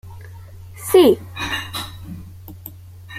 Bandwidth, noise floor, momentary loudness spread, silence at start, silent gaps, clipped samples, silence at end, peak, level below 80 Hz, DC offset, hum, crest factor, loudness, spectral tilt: 16 kHz; -38 dBFS; 26 LU; 0.05 s; none; under 0.1%; 0 s; -2 dBFS; -48 dBFS; under 0.1%; none; 20 dB; -17 LUFS; -5 dB/octave